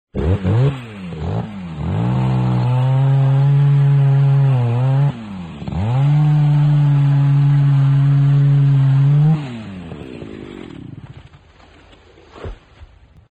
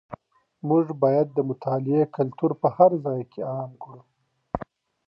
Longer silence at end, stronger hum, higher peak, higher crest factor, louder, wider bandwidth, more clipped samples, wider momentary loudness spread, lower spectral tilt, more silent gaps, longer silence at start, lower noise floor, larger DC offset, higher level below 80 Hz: about the same, 0.45 s vs 0.5 s; neither; about the same, -6 dBFS vs -4 dBFS; second, 8 dB vs 20 dB; first, -15 LUFS vs -24 LUFS; second, 4.4 kHz vs 5.6 kHz; neither; second, 19 LU vs 23 LU; second, -10 dB/octave vs -12 dB/octave; neither; about the same, 0.15 s vs 0.1 s; second, -46 dBFS vs -50 dBFS; neither; first, -38 dBFS vs -58 dBFS